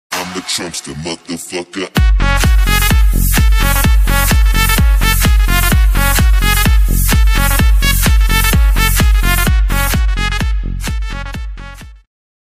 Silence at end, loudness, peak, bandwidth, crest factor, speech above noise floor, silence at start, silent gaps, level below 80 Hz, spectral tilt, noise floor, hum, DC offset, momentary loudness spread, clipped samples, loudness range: 0.55 s; -13 LUFS; 0 dBFS; 15.5 kHz; 12 dB; 17 dB; 0.1 s; none; -12 dBFS; -4 dB/octave; -31 dBFS; none; under 0.1%; 11 LU; under 0.1%; 3 LU